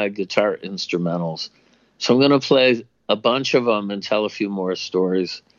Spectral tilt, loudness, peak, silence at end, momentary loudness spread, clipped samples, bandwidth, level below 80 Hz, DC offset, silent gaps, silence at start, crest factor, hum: -5 dB/octave; -20 LUFS; -2 dBFS; 0.2 s; 10 LU; under 0.1%; 7.4 kHz; -72 dBFS; under 0.1%; none; 0 s; 18 dB; none